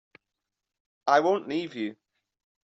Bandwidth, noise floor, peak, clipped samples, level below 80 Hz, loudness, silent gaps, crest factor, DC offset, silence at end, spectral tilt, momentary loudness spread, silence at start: 8 kHz; -86 dBFS; -8 dBFS; under 0.1%; -78 dBFS; -27 LUFS; none; 22 dB; under 0.1%; 0.75 s; -3 dB/octave; 13 LU; 1.05 s